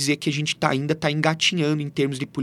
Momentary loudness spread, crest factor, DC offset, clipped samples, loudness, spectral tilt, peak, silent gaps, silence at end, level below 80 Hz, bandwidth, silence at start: 5 LU; 22 dB; under 0.1%; under 0.1%; -22 LUFS; -4.5 dB/octave; -2 dBFS; none; 0 s; -62 dBFS; 14 kHz; 0 s